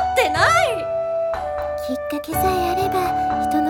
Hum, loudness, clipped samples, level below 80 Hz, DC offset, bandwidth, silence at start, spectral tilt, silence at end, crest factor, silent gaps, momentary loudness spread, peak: none; -20 LUFS; under 0.1%; -40 dBFS; under 0.1%; 18 kHz; 0 s; -4.5 dB/octave; 0 s; 16 dB; none; 10 LU; -4 dBFS